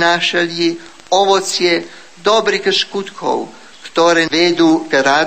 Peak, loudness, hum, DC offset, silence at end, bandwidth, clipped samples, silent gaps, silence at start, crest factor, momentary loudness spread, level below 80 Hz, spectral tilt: 0 dBFS; -14 LUFS; none; 0.6%; 0 s; 15 kHz; under 0.1%; none; 0 s; 14 dB; 10 LU; -60 dBFS; -3 dB/octave